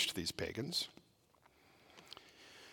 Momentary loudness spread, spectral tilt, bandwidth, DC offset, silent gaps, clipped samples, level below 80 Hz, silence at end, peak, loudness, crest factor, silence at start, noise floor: 21 LU; -2.5 dB/octave; 18 kHz; under 0.1%; none; under 0.1%; -72 dBFS; 0 s; -22 dBFS; -40 LUFS; 22 dB; 0 s; -70 dBFS